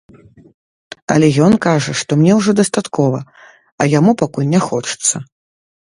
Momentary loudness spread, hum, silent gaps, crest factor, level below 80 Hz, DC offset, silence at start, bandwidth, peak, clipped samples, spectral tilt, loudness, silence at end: 7 LU; none; 3.72-3.78 s; 16 dB; -52 dBFS; under 0.1%; 1.1 s; 11.5 kHz; 0 dBFS; under 0.1%; -5.5 dB/octave; -14 LUFS; 0.6 s